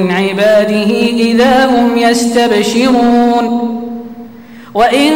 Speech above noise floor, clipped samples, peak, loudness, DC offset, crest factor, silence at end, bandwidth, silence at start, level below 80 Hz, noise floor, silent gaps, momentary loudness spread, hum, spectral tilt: 23 dB; under 0.1%; -2 dBFS; -10 LUFS; under 0.1%; 8 dB; 0 s; 16.5 kHz; 0 s; -44 dBFS; -32 dBFS; none; 12 LU; none; -4.5 dB/octave